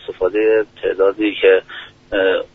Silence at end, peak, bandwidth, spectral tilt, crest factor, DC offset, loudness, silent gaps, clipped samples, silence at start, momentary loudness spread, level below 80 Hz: 0.1 s; -2 dBFS; 4 kHz; -1.5 dB/octave; 16 dB; under 0.1%; -16 LUFS; none; under 0.1%; 0.1 s; 9 LU; -48 dBFS